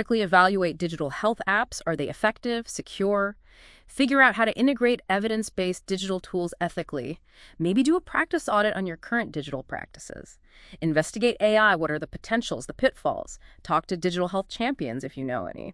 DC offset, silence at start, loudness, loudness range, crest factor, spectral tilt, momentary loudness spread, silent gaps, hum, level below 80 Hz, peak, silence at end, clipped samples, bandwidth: under 0.1%; 0 s; -25 LUFS; 4 LU; 22 dB; -5 dB/octave; 14 LU; none; none; -54 dBFS; -4 dBFS; 0 s; under 0.1%; 12 kHz